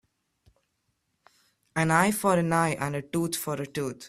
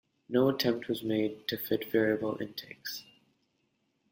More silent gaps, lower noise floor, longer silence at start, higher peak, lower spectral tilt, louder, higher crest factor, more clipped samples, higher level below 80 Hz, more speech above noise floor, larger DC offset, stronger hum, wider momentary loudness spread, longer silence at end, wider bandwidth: neither; about the same, -76 dBFS vs -76 dBFS; first, 1.75 s vs 0.3 s; first, -6 dBFS vs -14 dBFS; about the same, -5 dB/octave vs -5.5 dB/octave; first, -26 LUFS vs -31 LUFS; about the same, 22 dB vs 18 dB; neither; first, -62 dBFS vs -70 dBFS; first, 50 dB vs 45 dB; neither; neither; second, 9 LU vs 12 LU; second, 0 s vs 1.1 s; about the same, 15.5 kHz vs 16.5 kHz